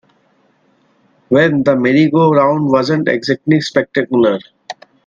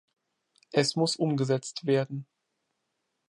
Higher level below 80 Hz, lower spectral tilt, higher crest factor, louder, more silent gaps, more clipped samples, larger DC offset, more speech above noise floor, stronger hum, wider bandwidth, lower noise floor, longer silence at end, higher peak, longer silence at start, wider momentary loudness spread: first, -56 dBFS vs -76 dBFS; first, -7 dB/octave vs -5 dB/octave; second, 14 dB vs 22 dB; first, -13 LUFS vs -28 LUFS; neither; neither; neither; second, 44 dB vs 53 dB; neither; second, 7.6 kHz vs 11.5 kHz; second, -56 dBFS vs -80 dBFS; second, 0.35 s vs 1.1 s; first, 0 dBFS vs -8 dBFS; first, 1.3 s vs 0.75 s; first, 9 LU vs 6 LU